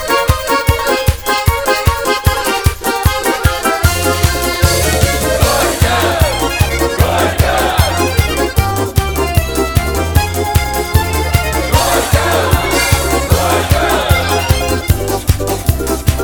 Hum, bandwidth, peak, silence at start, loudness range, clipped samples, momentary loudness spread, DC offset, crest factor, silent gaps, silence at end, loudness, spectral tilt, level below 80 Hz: none; over 20 kHz; 0 dBFS; 0 s; 2 LU; under 0.1%; 3 LU; under 0.1%; 12 dB; none; 0 s; -13 LUFS; -4 dB/octave; -20 dBFS